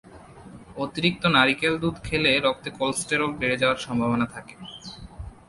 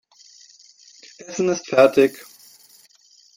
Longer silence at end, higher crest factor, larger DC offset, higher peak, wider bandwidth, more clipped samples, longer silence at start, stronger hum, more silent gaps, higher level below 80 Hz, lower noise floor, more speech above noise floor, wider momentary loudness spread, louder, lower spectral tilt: second, 0.15 s vs 1.25 s; about the same, 22 dB vs 20 dB; neither; about the same, -4 dBFS vs -2 dBFS; second, 11.5 kHz vs 16.5 kHz; neither; second, 0.05 s vs 1.3 s; neither; neither; first, -48 dBFS vs -68 dBFS; second, -45 dBFS vs -55 dBFS; second, 21 dB vs 36 dB; second, 21 LU vs 24 LU; second, -23 LUFS vs -18 LUFS; about the same, -4 dB/octave vs -4.5 dB/octave